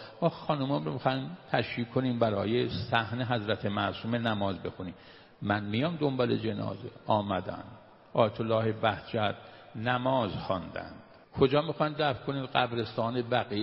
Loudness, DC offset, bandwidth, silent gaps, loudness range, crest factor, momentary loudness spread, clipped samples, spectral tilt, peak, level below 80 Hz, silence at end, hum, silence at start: -31 LUFS; under 0.1%; 5.8 kHz; none; 2 LU; 22 dB; 11 LU; under 0.1%; -9 dB/octave; -8 dBFS; -60 dBFS; 0 s; none; 0 s